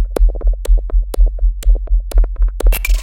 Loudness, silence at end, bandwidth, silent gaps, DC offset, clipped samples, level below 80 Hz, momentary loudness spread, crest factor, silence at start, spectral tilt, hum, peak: -18 LUFS; 0 s; 17 kHz; none; under 0.1%; under 0.1%; -12 dBFS; 3 LU; 12 dB; 0 s; -5.5 dB/octave; none; 0 dBFS